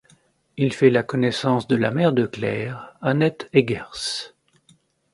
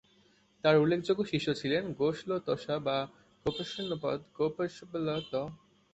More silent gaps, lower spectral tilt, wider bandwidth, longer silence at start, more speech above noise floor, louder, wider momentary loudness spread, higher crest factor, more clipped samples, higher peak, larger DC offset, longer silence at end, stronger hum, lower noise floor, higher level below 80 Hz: neither; about the same, -6 dB/octave vs -6.5 dB/octave; first, 11.5 kHz vs 8.2 kHz; about the same, 0.55 s vs 0.65 s; about the same, 38 dB vs 35 dB; first, -22 LUFS vs -32 LUFS; about the same, 10 LU vs 10 LU; about the same, 20 dB vs 20 dB; neither; first, -2 dBFS vs -12 dBFS; neither; first, 0.85 s vs 0.4 s; neither; second, -59 dBFS vs -66 dBFS; first, -58 dBFS vs -64 dBFS